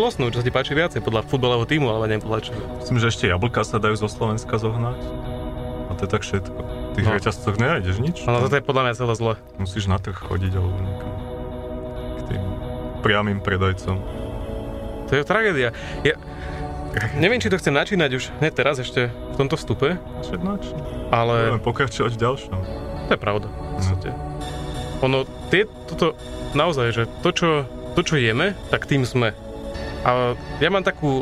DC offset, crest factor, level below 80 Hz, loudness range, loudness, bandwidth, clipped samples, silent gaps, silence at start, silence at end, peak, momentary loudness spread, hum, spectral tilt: under 0.1%; 20 dB; -36 dBFS; 4 LU; -23 LUFS; 13 kHz; under 0.1%; none; 0 s; 0 s; -2 dBFS; 11 LU; none; -6 dB/octave